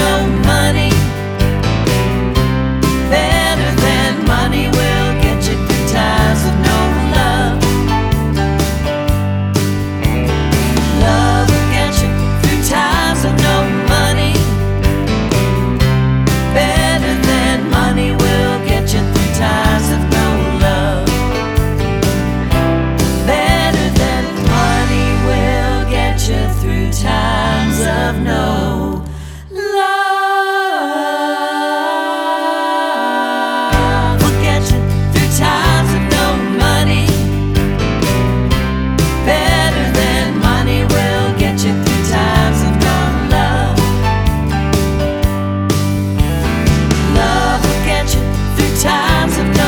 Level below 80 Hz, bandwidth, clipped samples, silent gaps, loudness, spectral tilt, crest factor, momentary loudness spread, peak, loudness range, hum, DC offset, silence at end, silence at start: -20 dBFS; over 20 kHz; under 0.1%; none; -14 LUFS; -5 dB/octave; 12 dB; 4 LU; 0 dBFS; 2 LU; none; under 0.1%; 0 s; 0 s